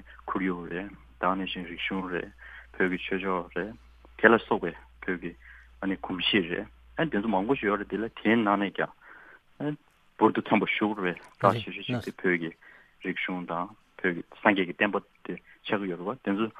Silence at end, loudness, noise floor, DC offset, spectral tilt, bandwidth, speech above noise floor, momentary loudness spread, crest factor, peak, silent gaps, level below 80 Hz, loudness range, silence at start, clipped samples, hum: 0 s; -29 LUFS; -53 dBFS; under 0.1%; -7 dB/octave; 11 kHz; 24 dB; 14 LU; 28 dB; -2 dBFS; none; -58 dBFS; 3 LU; 0.05 s; under 0.1%; none